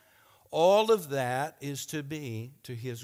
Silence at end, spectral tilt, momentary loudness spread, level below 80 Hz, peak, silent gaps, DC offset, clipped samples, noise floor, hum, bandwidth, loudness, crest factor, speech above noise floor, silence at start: 0 s; -4.5 dB/octave; 16 LU; -74 dBFS; -12 dBFS; none; under 0.1%; under 0.1%; -62 dBFS; none; 16.5 kHz; -29 LUFS; 18 dB; 33 dB; 0.5 s